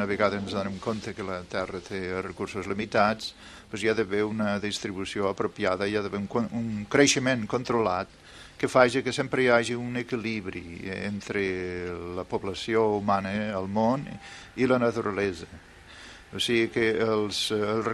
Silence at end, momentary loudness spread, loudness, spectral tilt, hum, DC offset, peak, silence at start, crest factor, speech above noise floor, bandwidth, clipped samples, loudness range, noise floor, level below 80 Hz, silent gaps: 0 s; 13 LU; -27 LUFS; -4.5 dB/octave; none; under 0.1%; -6 dBFS; 0 s; 22 dB; 20 dB; 13 kHz; under 0.1%; 4 LU; -47 dBFS; -56 dBFS; none